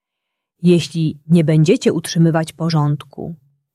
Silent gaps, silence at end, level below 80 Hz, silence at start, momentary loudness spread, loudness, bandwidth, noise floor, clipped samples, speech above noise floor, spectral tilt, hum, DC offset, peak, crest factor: none; 0.4 s; -56 dBFS; 0.6 s; 12 LU; -16 LUFS; 12.5 kHz; -79 dBFS; under 0.1%; 63 dB; -7 dB/octave; none; under 0.1%; -2 dBFS; 14 dB